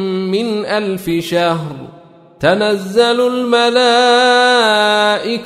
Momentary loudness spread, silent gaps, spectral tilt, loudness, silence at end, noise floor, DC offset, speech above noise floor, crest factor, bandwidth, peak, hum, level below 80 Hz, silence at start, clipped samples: 8 LU; none; -4 dB/octave; -13 LUFS; 0 s; -41 dBFS; under 0.1%; 28 dB; 12 dB; 15 kHz; 0 dBFS; none; -52 dBFS; 0 s; under 0.1%